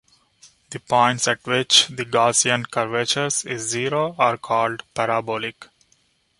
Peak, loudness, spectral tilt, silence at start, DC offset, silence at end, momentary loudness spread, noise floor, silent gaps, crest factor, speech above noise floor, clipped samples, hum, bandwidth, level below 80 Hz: 0 dBFS; -20 LUFS; -2 dB/octave; 0.45 s; under 0.1%; 0.75 s; 10 LU; -63 dBFS; none; 22 dB; 42 dB; under 0.1%; none; 11.5 kHz; -64 dBFS